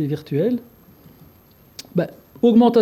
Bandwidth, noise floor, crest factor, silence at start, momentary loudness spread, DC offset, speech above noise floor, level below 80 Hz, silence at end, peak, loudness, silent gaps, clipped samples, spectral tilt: 13.5 kHz; -51 dBFS; 14 dB; 0 s; 19 LU; under 0.1%; 34 dB; -60 dBFS; 0 s; -6 dBFS; -20 LUFS; none; under 0.1%; -8 dB/octave